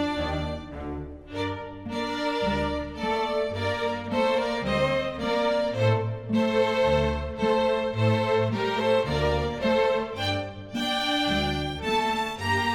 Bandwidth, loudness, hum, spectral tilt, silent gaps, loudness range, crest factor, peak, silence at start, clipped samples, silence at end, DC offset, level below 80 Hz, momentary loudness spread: 16 kHz; -26 LUFS; none; -6 dB/octave; none; 4 LU; 16 dB; -10 dBFS; 0 s; under 0.1%; 0 s; under 0.1%; -42 dBFS; 8 LU